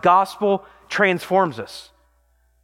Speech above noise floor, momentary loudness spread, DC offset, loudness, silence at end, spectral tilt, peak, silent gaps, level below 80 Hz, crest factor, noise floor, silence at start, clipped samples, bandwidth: 42 dB; 17 LU; under 0.1%; -20 LUFS; 0.8 s; -5.5 dB/octave; -4 dBFS; none; -62 dBFS; 18 dB; -61 dBFS; 0.05 s; under 0.1%; 16.5 kHz